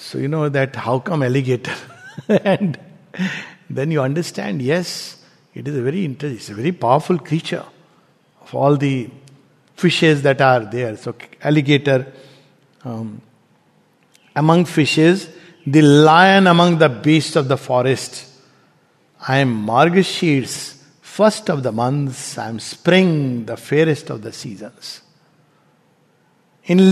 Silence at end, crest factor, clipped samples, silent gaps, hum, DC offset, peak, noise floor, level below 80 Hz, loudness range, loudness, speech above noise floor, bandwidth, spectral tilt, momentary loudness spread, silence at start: 0 s; 18 dB; under 0.1%; none; none; under 0.1%; 0 dBFS; -58 dBFS; -64 dBFS; 9 LU; -17 LUFS; 41 dB; 13.5 kHz; -6 dB/octave; 18 LU; 0 s